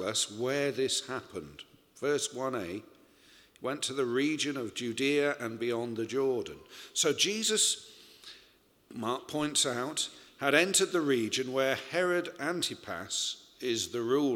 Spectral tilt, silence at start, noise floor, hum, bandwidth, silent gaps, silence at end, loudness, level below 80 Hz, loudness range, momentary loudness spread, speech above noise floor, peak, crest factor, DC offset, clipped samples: -2.5 dB/octave; 0 s; -64 dBFS; none; 17 kHz; none; 0 s; -31 LUFS; -72 dBFS; 5 LU; 14 LU; 32 dB; -8 dBFS; 24 dB; under 0.1%; under 0.1%